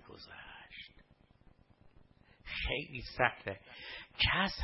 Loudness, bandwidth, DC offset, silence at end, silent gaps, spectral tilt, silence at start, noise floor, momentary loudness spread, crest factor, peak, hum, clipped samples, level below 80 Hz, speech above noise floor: -35 LUFS; 5.8 kHz; under 0.1%; 0 s; none; -1.5 dB/octave; 0.05 s; -64 dBFS; 21 LU; 28 dB; -12 dBFS; none; under 0.1%; -52 dBFS; 28 dB